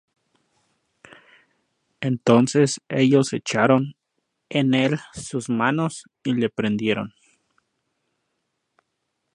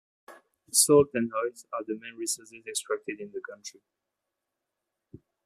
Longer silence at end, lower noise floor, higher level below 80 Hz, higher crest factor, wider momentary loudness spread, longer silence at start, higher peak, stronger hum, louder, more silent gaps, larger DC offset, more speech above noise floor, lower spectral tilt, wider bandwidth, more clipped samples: first, 2.25 s vs 1.75 s; second, -77 dBFS vs -85 dBFS; first, -64 dBFS vs -70 dBFS; about the same, 22 dB vs 24 dB; second, 12 LU vs 19 LU; first, 2 s vs 0.3 s; first, -2 dBFS vs -6 dBFS; neither; first, -22 LUFS vs -27 LUFS; neither; neither; about the same, 56 dB vs 57 dB; first, -5.5 dB/octave vs -3 dB/octave; second, 11.5 kHz vs 15 kHz; neither